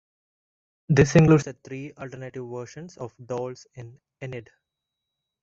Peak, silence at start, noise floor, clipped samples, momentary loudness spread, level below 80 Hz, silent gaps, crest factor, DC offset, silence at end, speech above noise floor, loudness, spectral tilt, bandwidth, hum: -4 dBFS; 0.9 s; -84 dBFS; under 0.1%; 23 LU; -50 dBFS; none; 22 dB; under 0.1%; 1 s; 60 dB; -21 LUFS; -7 dB/octave; 7.8 kHz; none